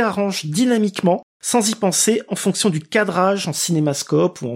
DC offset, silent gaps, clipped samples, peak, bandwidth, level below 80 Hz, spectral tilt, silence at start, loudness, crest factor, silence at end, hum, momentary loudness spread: under 0.1%; 1.23-1.40 s; under 0.1%; -2 dBFS; 16.5 kHz; -68 dBFS; -4 dB/octave; 0 s; -18 LUFS; 16 dB; 0 s; none; 4 LU